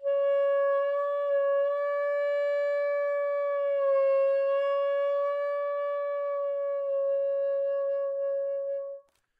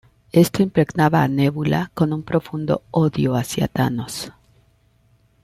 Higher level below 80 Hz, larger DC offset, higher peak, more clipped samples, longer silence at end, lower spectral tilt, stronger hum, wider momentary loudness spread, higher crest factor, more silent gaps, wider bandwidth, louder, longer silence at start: second, -90 dBFS vs -50 dBFS; neither; second, -18 dBFS vs -4 dBFS; neither; second, 0.4 s vs 1.15 s; second, -0.5 dB/octave vs -6.5 dB/octave; neither; about the same, 6 LU vs 6 LU; second, 10 dB vs 16 dB; neither; second, 4.8 kHz vs 15.5 kHz; second, -28 LUFS vs -20 LUFS; second, 0 s vs 0.35 s